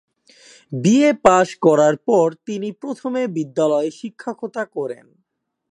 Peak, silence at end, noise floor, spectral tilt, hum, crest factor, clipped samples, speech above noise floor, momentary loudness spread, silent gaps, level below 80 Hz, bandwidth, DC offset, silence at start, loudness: 0 dBFS; 0.75 s; -49 dBFS; -6 dB/octave; none; 18 dB; under 0.1%; 31 dB; 15 LU; none; -58 dBFS; 11 kHz; under 0.1%; 0.7 s; -18 LUFS